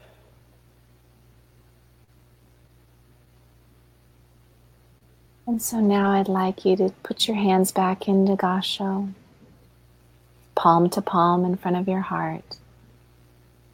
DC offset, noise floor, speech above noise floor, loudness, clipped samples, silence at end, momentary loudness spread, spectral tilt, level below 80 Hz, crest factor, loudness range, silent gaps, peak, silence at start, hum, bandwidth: under 0.1%; -56 dBFS; 35 dB; -22 LUFS; under 0.1%; 1.2 s; 11 LU; -5.5 dB/octave; -60 dBFS; 22 dB; 5 LU; none; -4 dBFS; 5.45 s; none; 16.5 kHz